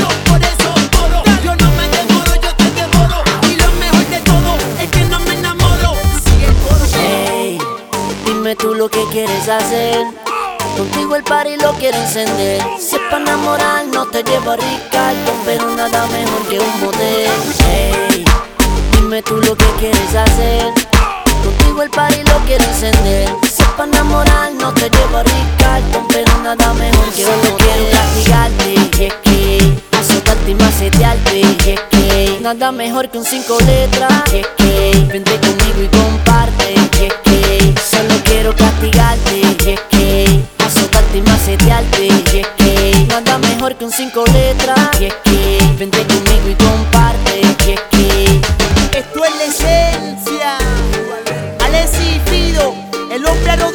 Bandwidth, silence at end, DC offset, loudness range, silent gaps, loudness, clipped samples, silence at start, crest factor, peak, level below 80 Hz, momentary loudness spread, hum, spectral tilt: over 20 kHz; 0 s; under 0.1%; 4 LU; none; -12 LUFS; under 0.1%; 0 s; 10 dB; 0 dBFS; -16 dBFS; 5 LU; none; -4.5 dB/octave